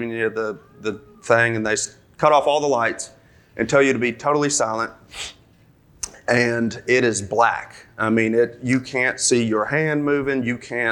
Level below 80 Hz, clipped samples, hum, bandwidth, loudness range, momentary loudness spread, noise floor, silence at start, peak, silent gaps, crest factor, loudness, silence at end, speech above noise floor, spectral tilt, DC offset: -56 dBFS; under 0.1%; none; 18 kHz; 3 LU; 14 LU; -54 dBFS; 0 s; -2 dBFS; none; 20 dB; -20 LUFS; 0 s; 33 dB; -4 dB/octave; under 0.1%